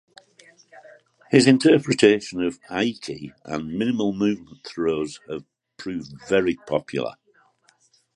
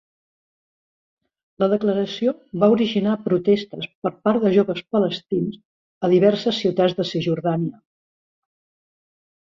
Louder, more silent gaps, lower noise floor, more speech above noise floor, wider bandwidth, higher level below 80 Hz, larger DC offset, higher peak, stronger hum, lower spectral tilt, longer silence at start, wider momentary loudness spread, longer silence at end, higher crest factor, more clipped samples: about the same, -22 LUFS vs -21 LUFS; second, none vs 3.95-4.02 s, 5.65-6.01 s; second, -62 dBFS vs under -90 dBFS; second, 40 dB vs over 70 dB; first, 11 kHz vs 7.4 kHz; about the same, -60 dBFS vs -64 dBFS; neither; first, 0 dBFS vs -4 dBFS; neither; second, -5.5 dB/octave vs -7.5 dB/octave; second, 0.75 s vs 1.6 s; first, 18 LU vs 9 LU; second, 1.05 s vs 1.75 s; about the same, 22 dB vs 18 dB; neither